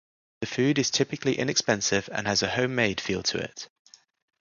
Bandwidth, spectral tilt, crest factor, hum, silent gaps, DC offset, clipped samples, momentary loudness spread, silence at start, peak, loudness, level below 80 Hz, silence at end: 10 kHz; -3.5 dB/octave; 22 dB; none; none; under 0.1%; under 0.1%; 11 LU; 0.4 s; -6 dBFS; -26 LUFS; -58 dBFS; 0.75 s